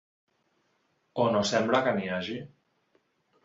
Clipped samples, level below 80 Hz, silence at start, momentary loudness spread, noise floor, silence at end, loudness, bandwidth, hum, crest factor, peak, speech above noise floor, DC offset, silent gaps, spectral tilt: under 0.1%; -66 dBFS; 1.15 s; 13 LU; -73 dBFS; 1 s; -27 LUFS; 7.8 kHz; none; 20 dB; -10 dBFS; 46 dB; under 0.1%; none; -4.5 dB/octave